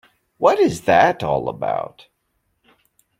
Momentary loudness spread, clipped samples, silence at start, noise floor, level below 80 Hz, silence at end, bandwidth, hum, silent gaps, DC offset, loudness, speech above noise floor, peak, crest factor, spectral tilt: 10 LU; under 0.1%; 0.4 s; -70 dBFS; -54 dBFS; 1.3 s; 16 kHz; none; none; under 0.1%; -18 LUFS; 52 dB; -2 dBFS; 18 dB; -5.5 dB/octave